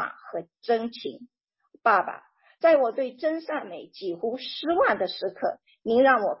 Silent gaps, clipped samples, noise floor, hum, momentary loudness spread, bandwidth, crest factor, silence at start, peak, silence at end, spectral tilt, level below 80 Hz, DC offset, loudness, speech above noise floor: none; under 0.1%; -62 dBFS; none; 16 LU; 5.8 kHz; 18 dB; 0 s; -8 dBFS; 0.05 s; -8 dB/octave; -72 dBFS; under 0.1%; -25 LUFS; 37 dB